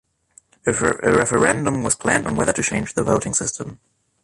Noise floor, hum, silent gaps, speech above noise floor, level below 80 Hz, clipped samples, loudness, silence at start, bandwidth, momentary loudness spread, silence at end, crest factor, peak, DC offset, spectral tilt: -55 dBFS; none; none; 35 dB; -44 dBFS; under 0.1%; -19 LUFS; 0.65 s; 11.5 kHz; 8 LU; 0.5 s; 18 dB; -2 dBFS; under 0.1%; -4.5 dB/octave